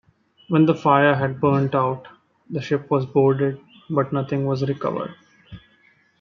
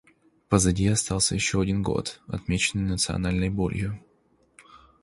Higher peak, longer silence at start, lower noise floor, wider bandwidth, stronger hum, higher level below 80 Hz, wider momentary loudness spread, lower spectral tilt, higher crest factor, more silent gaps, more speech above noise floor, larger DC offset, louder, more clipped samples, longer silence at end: about the same, -2 dBFS vs -4 dBFS; about the same, 0.5 s vs 0.5 s; second, -59 dBFS vs -64 dBFS; second, 6.6 kHz vs 11.5 kHz; neither; second, -60 dBFS vs -40 dBFS; first, 14 LU vs 10 LU; first, -8.5 dB/octave vs -4.5 dB/octave; about the same, 20 dB vs 22 dB; neither; about the same, 39 dB vs 39 dB; neither; first, -21 LUFS vs -25 LUFS; neither; first, 0.6 s vs 0.25 s